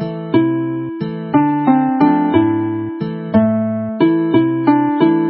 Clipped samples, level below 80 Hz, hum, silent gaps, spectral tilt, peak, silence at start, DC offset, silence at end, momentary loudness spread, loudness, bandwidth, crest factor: under 0.1%; -50 dBFS; none; none; -13 dB/octave; 0 dBFS; 0 s; under 0.1%; 0 s; 9 LU; -15 LUFS; 4.6 kHz; 14 dB